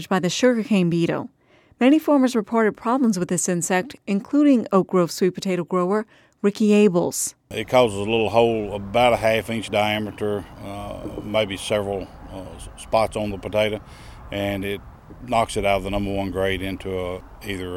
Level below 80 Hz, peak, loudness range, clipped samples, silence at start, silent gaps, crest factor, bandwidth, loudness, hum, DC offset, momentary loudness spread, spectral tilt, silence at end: -44 dBFS; -2 dBFS; 6 LU; under 0.1%; 0 s; none; 18 dB; 16.5 kHz; -21 LUFS; none; under 0.1%; 15 LU; -5 dB/octave; 0 s